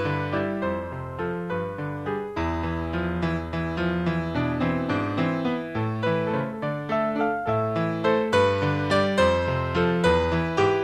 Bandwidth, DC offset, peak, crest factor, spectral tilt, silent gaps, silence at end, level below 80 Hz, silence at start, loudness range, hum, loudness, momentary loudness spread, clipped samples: 11 kHz; under 0.1%; -8 dBFS; 16 dB; -7 dB/octave; none; 0 s; -44 dBFS; 0 s; 6 LU; none; -25 LUFS; 8 LU; under 0.1%